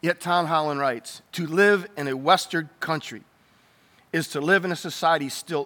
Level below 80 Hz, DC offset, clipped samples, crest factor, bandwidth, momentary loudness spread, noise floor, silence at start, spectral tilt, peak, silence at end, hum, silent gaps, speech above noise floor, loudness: -78 dBFS; under 0.1%; under 0.1%; 18 dB; 19.5 kHz; 11 LU; -59 dBFS; 0.05 s; -4.5 dB/octave; -6 dBFS; 0 s; none; none; 36 dB; -23 LUFS